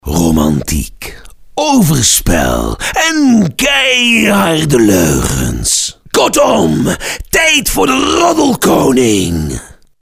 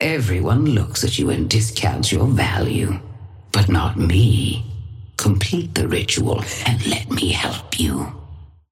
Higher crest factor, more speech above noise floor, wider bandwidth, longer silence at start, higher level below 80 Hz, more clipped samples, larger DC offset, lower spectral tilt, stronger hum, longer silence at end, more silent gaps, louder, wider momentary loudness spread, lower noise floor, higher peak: second, 10 dB vs 16 dB; about the same, 21 dB vs 21 dB; about the same, 16 kHz vs 16 kHz; about the same, 0.05 s vs 0 s; first, -26 dBFS vs -34 dBFS; neither; first, 0.2% vs under 0.1%; second, -3.5 dB/octave vs -5 dB/octave; neither; about the same, 0.35 s vs 0.25 s; neither; first, -10 LUFS vs -19 LUFS; about the same, 9 LU vs 10 LU; second, -31 dBFS vs -39 dBFS; first, 0 dBFS vs -4 dBFS